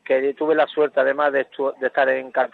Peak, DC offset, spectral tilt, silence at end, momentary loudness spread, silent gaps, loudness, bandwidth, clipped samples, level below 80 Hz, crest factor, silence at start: -4 dBFS; under 0.1%; -6.5 dB/octave; 0.05 s; 4 LU; none; -20 LUFS; 4.4 kHz; under 0.1%; -80 dBFS; 16 dB; 0.1 s